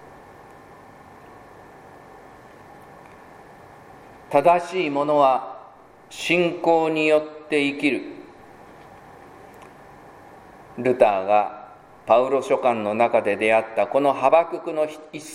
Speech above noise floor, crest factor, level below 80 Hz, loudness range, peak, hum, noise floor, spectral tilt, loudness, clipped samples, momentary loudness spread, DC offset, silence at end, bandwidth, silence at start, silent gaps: 27 dB; 22 dB; -64 dBFS; 7 LU; -2 dBFS; none; -47 dBFS; -5 dB/octave; -21 LUFS; under 0.1%; 16 LU; under 0.1%; 0 s; 15 kHz; 1.3 s; none